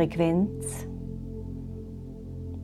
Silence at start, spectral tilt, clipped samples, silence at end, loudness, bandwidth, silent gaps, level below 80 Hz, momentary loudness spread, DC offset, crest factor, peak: 0 s; -7 dB/octave; under 0.1%; 0 s; -32 LUFS; 14 kHz; none; -44 dBFS; 16 LU; under 0.1%; 20 dB; -10 dBFS